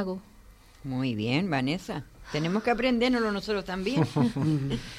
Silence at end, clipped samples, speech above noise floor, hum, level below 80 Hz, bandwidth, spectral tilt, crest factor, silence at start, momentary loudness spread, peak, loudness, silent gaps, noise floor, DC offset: 0 s; under 0.1%; 25 dB; none; -50 dBFS; 14 kHz; -6.5 dB/octave; 16 dB; 0 s; 11 LU; -12 dBFS; -28 LUFS; none; -53 dBFS; under 0.1%